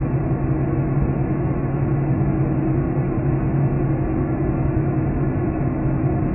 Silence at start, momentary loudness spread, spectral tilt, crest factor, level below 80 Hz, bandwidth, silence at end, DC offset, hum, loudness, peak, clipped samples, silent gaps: 0 s; 2 LU; -8.5 dB/octave; 12 dB; -30 dBFS; 2.9 kHz; 0 s; under 0.1%; none; -21 LUFS; -8 dBFS; under 0.1%; none